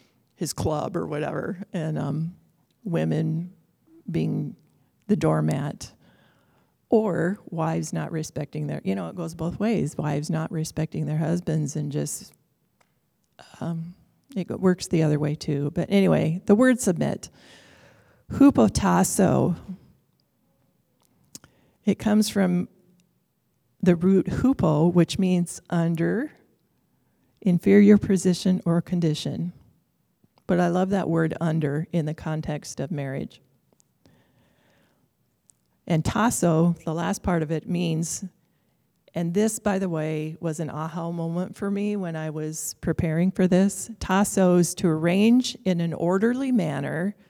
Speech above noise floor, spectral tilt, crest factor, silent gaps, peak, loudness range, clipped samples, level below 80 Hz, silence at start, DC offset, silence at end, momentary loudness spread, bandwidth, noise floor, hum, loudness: 47 dB; -6.5 dB/octave; 20 dB; none; -4 dBFS; 7 LU; under 0.1%; -52 dBFS; 0.4 s; under 0.1%; 0.15 s; 12 LU; 16 kHz; -71 dBFS; none; -24 LUFS